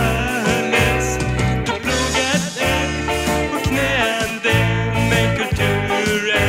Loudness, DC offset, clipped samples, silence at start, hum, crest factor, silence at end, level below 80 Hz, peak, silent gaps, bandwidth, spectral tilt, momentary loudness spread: -18 LUFS; 0.2%; under 0.1%; 0 s; none; 16 dB; 0 s; -30 dBFS; -2 dBFS; none; 16 kHz; -4.5 dB/octave; 3 LU